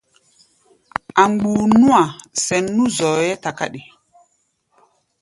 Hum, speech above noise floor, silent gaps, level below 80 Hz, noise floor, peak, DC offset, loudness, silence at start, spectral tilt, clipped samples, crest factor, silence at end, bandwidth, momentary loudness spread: none; 50 dB; none; -56 dBFS; -66 dBFS; 0 dBFS; under 0.1%; -17 LUFS; 1.15 s; -4.5 dB/octave; under 0.1%; 18 dB; 1.4 s; 11.5 kHz; 14 LU